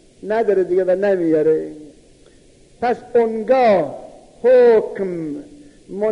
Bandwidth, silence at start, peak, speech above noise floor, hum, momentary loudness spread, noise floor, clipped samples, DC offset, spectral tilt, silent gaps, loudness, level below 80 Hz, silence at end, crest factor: 10 kHz; 0.25 s; -4 dBFS; 33 dB; none; 15 LU; -49 dBFS; under 0.1%; under 0.1%; -7.5 dB/octave; none; -17 LUFS; -54 dBFS; 0 s; 14 dB